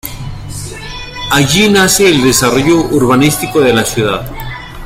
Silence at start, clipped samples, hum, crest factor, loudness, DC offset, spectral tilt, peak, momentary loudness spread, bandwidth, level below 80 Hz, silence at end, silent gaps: 0.05 s; under 0.1%; none; 12 dB; -9 LUFS; under 0.1%; -4 dB/octave; 0 dBFS; 17 LU; 16.5 kHz; -30 dBFS; 0 s; none